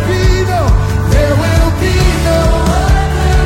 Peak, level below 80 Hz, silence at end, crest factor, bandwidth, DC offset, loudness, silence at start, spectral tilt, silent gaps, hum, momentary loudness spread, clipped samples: 0 dBFS; -14 dBFS; 0 s; 10 dB; 16.5 kHz; under 0.1%; -12 LUFS; 0 s; -6 dB/octave; none; none; 1 LU; under 0.1%